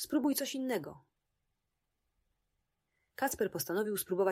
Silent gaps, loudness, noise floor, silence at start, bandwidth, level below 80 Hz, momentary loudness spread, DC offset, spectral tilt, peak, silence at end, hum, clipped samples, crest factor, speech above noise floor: none; -35 LUFS; -85 dBFS; 0 s; 16 kHz; -72 dBFS; 7 LU; under 0.1%; -4 dB/octave; -20 dBFS; 0 s; none; under 0.1%; 18 dB; 51 dB